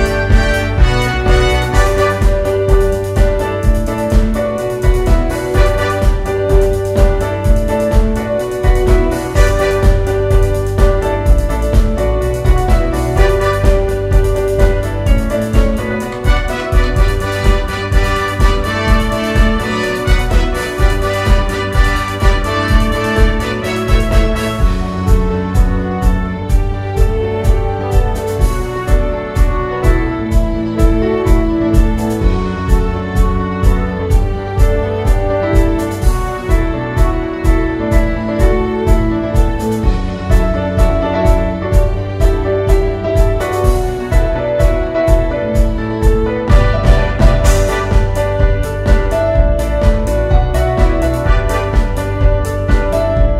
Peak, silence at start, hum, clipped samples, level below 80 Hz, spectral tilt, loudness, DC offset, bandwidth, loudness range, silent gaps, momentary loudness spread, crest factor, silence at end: 0 dBFS; 0 s; none; under 0.1%; -14 dBFS; -6.5 dB/octave; -14 LUFS; under 0.1%; 14 kHz; 2 LU; none; 3 LU; 12 dB; 0 s